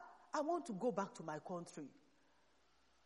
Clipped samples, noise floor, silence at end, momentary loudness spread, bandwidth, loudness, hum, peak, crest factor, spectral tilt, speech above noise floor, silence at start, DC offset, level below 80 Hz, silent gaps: under 0.1%; -76 dBFS; 1.15 s; 13 LU; 11.5 kHz; -44 LUFS; none; -26 dBFS; 20 dB; -6 dB/octave; 32 dB; 0 s; under 0.1%; -88 dBFS; none